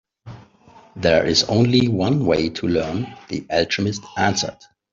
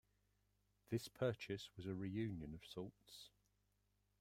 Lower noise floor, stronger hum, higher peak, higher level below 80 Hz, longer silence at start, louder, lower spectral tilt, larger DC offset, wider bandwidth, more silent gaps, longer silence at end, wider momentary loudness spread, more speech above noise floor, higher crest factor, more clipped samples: second, -49 dBFS vs -83 dBFS; second, none vs 50 Hz at -65 dBFS; first, -2 dBFS vs -28 dBFS; first, -50 dBFS vs -74 dBFS; second, 0.25 s vs 0.9 s; first, -19 LUFS vs -48 LUFS; second, -5 dB/octave vs -6.5 dB/octave; neither; second, 7.6 kHz vs 16 kHz; neither; second, 0.4 s vs 0.9 s; second, 11 LU vs 16 LU; second, 30 dB vs 36 dB; about the same, 18 dB vs 20 dB; neither